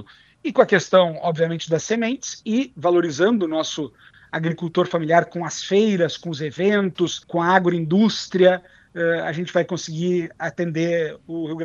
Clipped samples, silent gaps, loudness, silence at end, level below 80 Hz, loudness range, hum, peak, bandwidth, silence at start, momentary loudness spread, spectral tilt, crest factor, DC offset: under 0.1%; none; -21 LUFS; 0 s; -64 dBFS; 2 LU; none; -2 dBFS; 7.6 kHz; 0 s; 10 LU; -5.5 dB/octave; 20 dB; under 0.1%